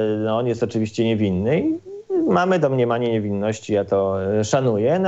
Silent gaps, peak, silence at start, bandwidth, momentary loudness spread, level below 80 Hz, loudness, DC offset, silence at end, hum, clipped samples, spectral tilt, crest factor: none; -6 dBFS; 0 s; 8.2 kHz; 5 LU; -62 dBFS; -21 LUFS; 0.1%; 0 s; none; under 0.1%; -7 dB/octave; 14 dB